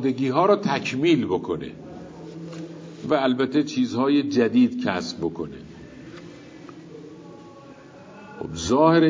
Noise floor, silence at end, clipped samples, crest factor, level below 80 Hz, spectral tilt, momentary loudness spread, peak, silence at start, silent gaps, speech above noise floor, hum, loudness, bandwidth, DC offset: -45 dBFS; 0 s; under 0.1%; 18 dB; -54 dBFS; -6 dB/octave; 23 LU; -4 dBFS; 0 s; none; 24 dB; none; -22 LUFS; 7.6 kHz; under 0.1%